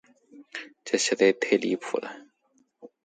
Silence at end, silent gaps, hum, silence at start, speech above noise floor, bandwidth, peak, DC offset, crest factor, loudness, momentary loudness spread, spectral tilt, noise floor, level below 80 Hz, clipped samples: 0.2 s; none; none; 0.35 s; 43 dB; 9.4 kHz; -8 dBFS; under 0.1%; 20 dB; -25 LUFS; 19 LU; -3 dB/octave; -68 dBFS; -78 dBFS; under 0.1%